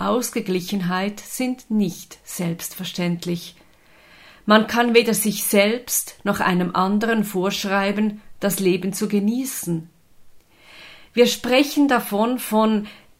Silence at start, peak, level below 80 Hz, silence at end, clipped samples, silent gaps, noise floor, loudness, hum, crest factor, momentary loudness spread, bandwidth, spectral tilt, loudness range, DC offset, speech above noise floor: 0 s; 0 dBFS; -58 dBFS; 0.25 s; under 0.1%; none; -52 dBFS; -21 LUFS; none; 20 dB; 11 LU; 16 kHz; -4.5 dB/octave; 6 LU; under 0.1%; 31 dB